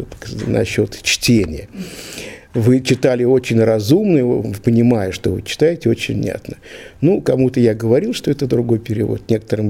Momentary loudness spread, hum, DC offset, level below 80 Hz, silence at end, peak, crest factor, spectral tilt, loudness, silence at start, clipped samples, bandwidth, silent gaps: 15 LU; none; 0.2%; -42 dBFS; 0 s; 0 dBFS; 16 dB; -6 dB/octave; -16 LUFS; 0 s; under 0.1%; 16.5 kHz; none